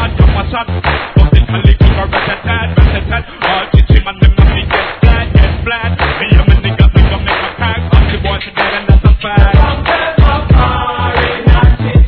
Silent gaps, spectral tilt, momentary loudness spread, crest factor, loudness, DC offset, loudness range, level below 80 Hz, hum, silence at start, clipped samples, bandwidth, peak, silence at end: none; -9.5 dB/octave; 6 LU; 8 dB; -11 LUFS; 0.3%; 1 LU; -12 dBFS; none; 0 s; 2%; 4.5 kHz; 0 dBFS; 0 s